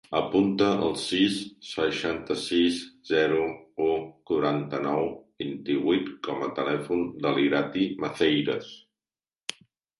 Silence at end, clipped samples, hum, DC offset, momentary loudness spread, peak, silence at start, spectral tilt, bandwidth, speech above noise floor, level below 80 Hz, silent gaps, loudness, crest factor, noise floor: 1.2 s; under 0.1%; none; under 0.1%; 10 LU; -10 dBFS; 0.1 s; -5 dB/octave; 11.5 kHz; over 64 dB; -62 dBFS; none; -27 LUFS; 18 dB; under -90 dBFS